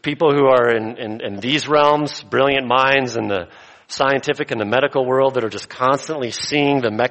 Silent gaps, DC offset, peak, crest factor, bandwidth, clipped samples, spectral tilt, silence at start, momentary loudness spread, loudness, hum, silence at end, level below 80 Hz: none; under 0.1%; -2 dBFS; 16 dB; 8.8 kHz; under 0.1%; -4.5 dB/octave; 0.05 s; 11 LU; -18 LUFS; none; 0 s; -56 dBFS